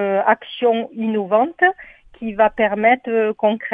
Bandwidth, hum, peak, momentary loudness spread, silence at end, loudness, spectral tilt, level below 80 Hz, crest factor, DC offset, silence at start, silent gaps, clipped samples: 3.8 kHz; none; 0 dBFS; 7 LU; 0 s; -18 LUFS; -8 dB/octave; -54 dBFS; 18 dB; under 0.1%; 0 s; none; under 0.1%